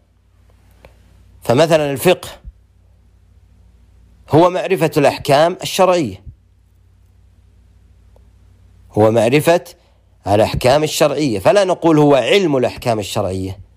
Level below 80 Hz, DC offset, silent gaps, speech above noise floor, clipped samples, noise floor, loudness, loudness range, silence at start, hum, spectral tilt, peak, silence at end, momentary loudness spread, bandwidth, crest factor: -44 dBFS; under 0.1%; none; 38 dB; under 0.1%; -52 dBFS; -14 LUFS; 6 LU; 1.45 s; none; -5.5 dB/octave; -2 dBFS; 0.15 s; 8 LU; 15.5 kHz; 14 dB